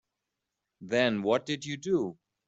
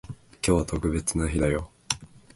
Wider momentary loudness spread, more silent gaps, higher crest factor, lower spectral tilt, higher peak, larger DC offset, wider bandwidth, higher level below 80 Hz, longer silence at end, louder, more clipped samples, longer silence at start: about the same, 8 LU vs 7 LU; neither; about the same, 20 dB vs 24 dB; about the same, -5 dB/octave vs -5 dB/octave; second, -10 dBFS vs -2 dBFS; neither; second, 8 kHz vs 11.5 kHz; second, -72 dBFS vs -36 dBFS; about the same, 0.35 s vs 0.3 s; second, -30 LUFS vs -27 LUFS; neither; first, 0.8 s vs 0.05 s